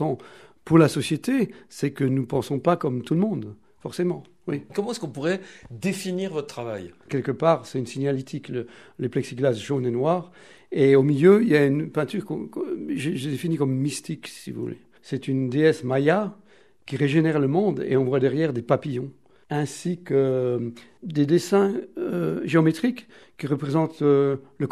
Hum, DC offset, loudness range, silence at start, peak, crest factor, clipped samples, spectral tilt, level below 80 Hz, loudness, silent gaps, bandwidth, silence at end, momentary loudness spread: none; 0.1%; 7 LU; 0 s; -4 dBFS; 20 dB; under 0.1%; -7 dB/octave; -66 dBFS; -24 LUFS; none; 13.5 kHz; 0 s; 14 LU